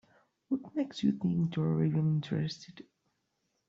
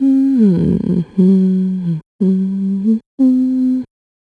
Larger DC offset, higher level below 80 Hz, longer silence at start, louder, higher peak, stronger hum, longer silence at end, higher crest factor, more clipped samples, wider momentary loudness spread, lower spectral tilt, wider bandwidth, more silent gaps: neither; second, -70 dBFS vs -44 dBFS; first, 0.5 s vs 0 s; second, -32 LUFS vs -15 LUFS; second, -16 dBFS vs -2 dBFS; neither; first, 0.85 s vs 0.4 s; about the same, 16 dB vs 12 dB; neither; about the same, 9 LU vs 7 LU; second, -8 dB/octave vs -11 dB/octave; first, 7.4 kHz vs 4.5 kHz; second, none vs 2.06-2.19 s, 3.06-3.18 s